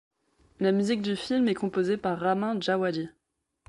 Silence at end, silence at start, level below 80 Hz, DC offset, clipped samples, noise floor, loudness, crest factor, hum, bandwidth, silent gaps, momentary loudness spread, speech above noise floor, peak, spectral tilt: 0.6 s; 0.6 s; -66 dBFS; under 0.1%; under 0.1%; -66 dBFS; -27 LUFS; 16 dB; none; 11.5 kHz; none; 4 LU; 39 dB; -12 dBFS; -6 dB/octave